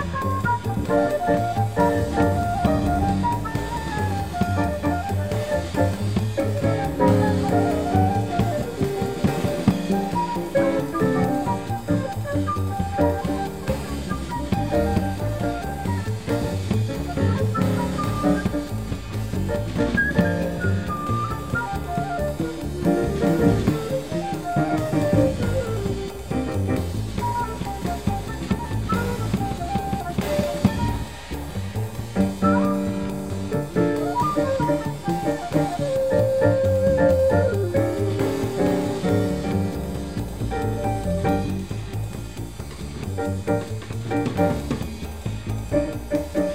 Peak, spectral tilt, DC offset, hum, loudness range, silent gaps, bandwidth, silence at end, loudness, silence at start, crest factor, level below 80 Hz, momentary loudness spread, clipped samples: -4 dBFS; -7 dB/octave; 0.6%; none; 5 LU; none; 16 kHz; 0 s; -24 LUFS; 0 s; 20 dB; -36 dBFS; 9 LU; under 0.1%